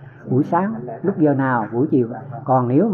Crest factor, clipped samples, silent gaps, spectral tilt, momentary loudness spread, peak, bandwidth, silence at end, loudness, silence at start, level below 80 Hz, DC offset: 14 dB; under 0.1%; none; -11.5 dB/octave; 8 LU; -6 dBFS; 3.4 kHz; 0 s; -19 LUFS; 0 s; -64 dBFS; under 0.1%